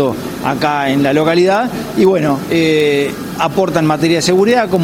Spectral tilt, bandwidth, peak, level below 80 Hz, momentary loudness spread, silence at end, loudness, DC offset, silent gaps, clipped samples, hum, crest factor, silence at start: -5.5 dB/octave; 16.5 kHz; 0 dBFS; -46 dBFS; 7 LU; 0 s; -13 LUFS; under 0.1%; none; under 0.1%; none; 12 dB; 0 s